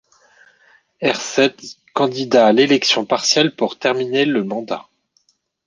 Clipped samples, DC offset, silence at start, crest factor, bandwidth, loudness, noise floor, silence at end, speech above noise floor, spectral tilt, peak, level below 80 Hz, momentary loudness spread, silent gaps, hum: under 0.1%; under 0.1%; 1 s; 18 dB; 10 kHz; -17 LUFS; -63 dBFS; 0.85 s; 46 dB; -3.5 dB/octave; -2 dBFS; -64 dBFS; 12 LU; none; none